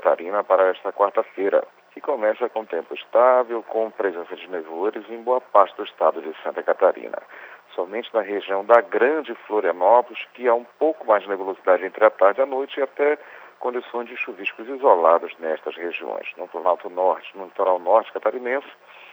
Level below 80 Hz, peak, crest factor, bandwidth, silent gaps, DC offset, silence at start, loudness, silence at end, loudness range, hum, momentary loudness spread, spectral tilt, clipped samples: under -90 dBFS; 0 dBFS; 22 dB; over 20 kHz; none; under 0.1%; 0 s; -22 LUFS; 0.4 s; 3 LU; none; 14 LU; -5.5 dB/octave; under 0.1%